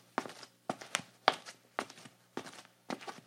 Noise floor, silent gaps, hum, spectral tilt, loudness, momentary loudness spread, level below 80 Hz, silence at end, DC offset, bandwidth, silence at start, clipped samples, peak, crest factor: -57 dBFS; none; none; -2 dB/octave; -39 LUFS; 16 LU; under -90 dBFS; 0.05 s; under 0.1%; 16.5 kHz; 0.2 s; under 0.1%; -6 dBFS; 36 dB